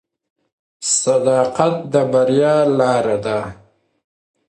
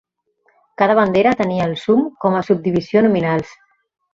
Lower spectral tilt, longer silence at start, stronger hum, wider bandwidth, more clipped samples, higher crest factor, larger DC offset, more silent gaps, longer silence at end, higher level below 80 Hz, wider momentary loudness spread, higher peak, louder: second, -4.5 dB/octave vs -7.5 dB/octave; about the same, 0.8 s vs 0.8 s; neither; first, 11.5 kHz vs 7.6 kHz; neither; about the same, 16 dB vs 16 dB; neither; neither; first, 0.95 s vs 0.6 s; about the same, -56 dBFS vs -54 dBFS; first, 9 LU vs 6 LU; about the same, 0 dBFS vs -2 dBFS; about the same, -16 LUFS vs -16 LUFS